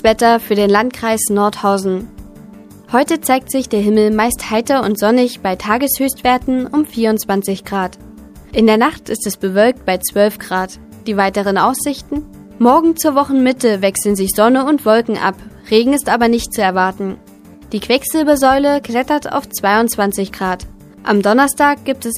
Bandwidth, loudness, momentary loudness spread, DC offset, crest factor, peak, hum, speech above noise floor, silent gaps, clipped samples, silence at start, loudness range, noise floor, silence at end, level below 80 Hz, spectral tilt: 15.5 kHz; -15 LUFS; 9 LU; under 0.1%; 14 dB; 0 dBFS; none; 23 dB; none; under 0.1%; 0.05 s; 2 LU; -37 dBFS; 0 s; -42 dBFS; -4 dB/octave